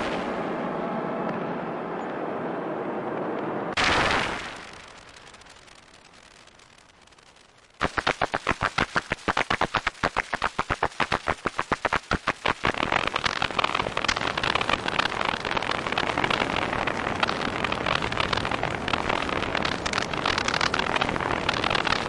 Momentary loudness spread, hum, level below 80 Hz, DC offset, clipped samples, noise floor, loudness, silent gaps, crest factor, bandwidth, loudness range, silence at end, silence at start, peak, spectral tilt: 7 LU; none; -46 dBFS; under 0.1%; under 0.1%; -55 dBFS; -26 LUFS; none; 18 dB; 11.5 kHz; 5 LU; 0 s; 0 s; -10 dBFS; -3.5 dB/octave